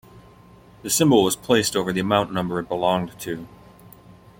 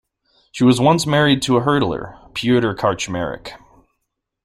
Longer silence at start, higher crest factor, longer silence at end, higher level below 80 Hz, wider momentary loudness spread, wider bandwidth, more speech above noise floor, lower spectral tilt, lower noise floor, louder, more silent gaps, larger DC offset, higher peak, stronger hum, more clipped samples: second, 0.15 s vs 0.55 s; about the same, 20 dB vs 16 dB; about the same, 0.9 s vs 0.9 s; second, -54 dBFS vs -48 dBFS; about the same, 15 LU vs 14 LU; first, 16.5 kHz vs 14.5 kHz; second, 28 dB vs 59 dB; second, -4 dB/octave vs -5.5 dB/octave; second, -49 dBFS vs -76 dBFS; second, -21 LUFS vs -17 LUFS; neither; neither; about the same, -2 dBFS vs -2 dBFS; neither; neither